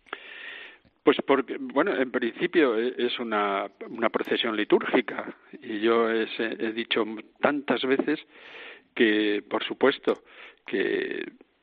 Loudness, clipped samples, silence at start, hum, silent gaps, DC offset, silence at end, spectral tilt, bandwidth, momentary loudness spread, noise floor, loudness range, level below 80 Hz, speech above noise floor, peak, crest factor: -26 LUFS; under 0.1%; 0.1 s; none; none; under 0.1%; 0.35 s; -2 dB/octave; 4.8 kHz; 17 LU; -47 dBFS; 2 LU; -76 dBFS; 21 dB; -6 dBFS; 20 dB